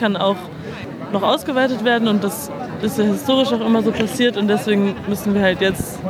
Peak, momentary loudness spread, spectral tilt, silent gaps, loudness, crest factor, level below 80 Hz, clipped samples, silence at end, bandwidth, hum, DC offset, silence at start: -2 dBFS; 10 LU; -5 dB/octave; none; -18 LUFS; 16 dB; -48 dBFS; under 0.1%; 0 s; 16 kHz; none; under 0.1%; 0 s